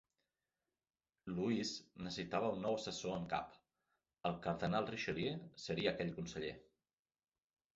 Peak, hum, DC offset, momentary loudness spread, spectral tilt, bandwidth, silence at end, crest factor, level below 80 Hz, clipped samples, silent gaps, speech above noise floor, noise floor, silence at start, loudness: -22 dBFS; none; under 0.1%; 9 LU; -4.5 dB/octave; 7.6 kHz; 1.15 s; 20 dB; -70 dBFS; under 0.1%; none; over 49 dB; under -90 dBFS; 1.25 s; -42 LUFS